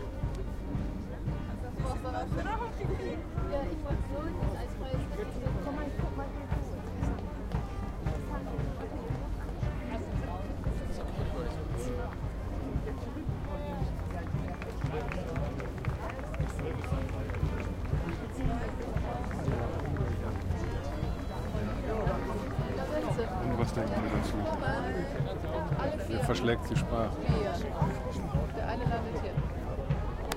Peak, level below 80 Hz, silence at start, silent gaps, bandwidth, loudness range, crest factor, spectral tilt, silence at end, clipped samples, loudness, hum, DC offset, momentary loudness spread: -12 dBFS; -38 dBFS; 0 s; none; 15.5 kHz; 5 LU; 20 dB; -7 dB/octave; 0 s; under 0.1%; -35 LUFS; none; under 0.1%; 6 LU